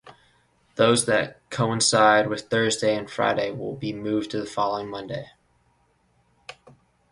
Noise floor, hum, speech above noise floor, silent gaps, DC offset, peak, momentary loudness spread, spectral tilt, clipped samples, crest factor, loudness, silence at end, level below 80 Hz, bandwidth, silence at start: -65 dBFS; none; 42 dB; none; under 0.1%; -2 dBFS; 17 LU; -3.5 dB/octave; under 0.1%; 22 dB; -23 LUFS; 0.6 s; -60 dBFS; 11.5 kHz; 0.05 s